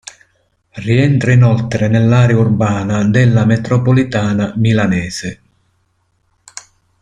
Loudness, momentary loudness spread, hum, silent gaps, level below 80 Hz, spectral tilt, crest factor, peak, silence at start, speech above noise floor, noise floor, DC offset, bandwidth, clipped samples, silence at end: -13 LUFS; 15 LU; none; none; -42 dBFS; -7 dB/octave; 12 dB; -2 dBFS; 0.75 s; 50 dB; -61 dBFS; under 0.1%; 9.6 kHz; under 0.1%; 1.7 s